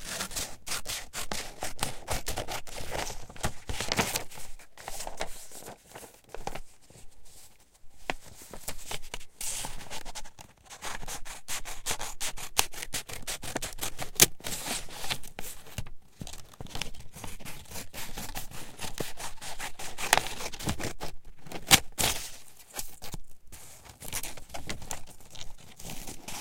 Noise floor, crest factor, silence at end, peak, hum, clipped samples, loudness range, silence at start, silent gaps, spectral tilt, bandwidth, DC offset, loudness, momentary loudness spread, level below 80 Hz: -53 dBFS; 32 dB; 0 s; 0 dBFS; none; under 0.1%; 13 LU; 0 s; none; -1.5 dB/octave; 17 kHz; under 0.1%; -33 LUFS; 18 LU; -46 dBFS